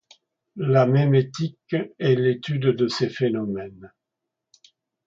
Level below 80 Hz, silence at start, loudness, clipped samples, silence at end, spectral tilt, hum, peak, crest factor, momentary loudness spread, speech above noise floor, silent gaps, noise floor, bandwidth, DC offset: -64 dBFS; 0.55 s; -22 LUFS; under 0.1%; 1.2 s; -7.5 dB/octave; none; -4 dBFS; 18 dB; 12 LU; 62 dB; none; -84 dBFS; 7.6 kHz; under 0.1%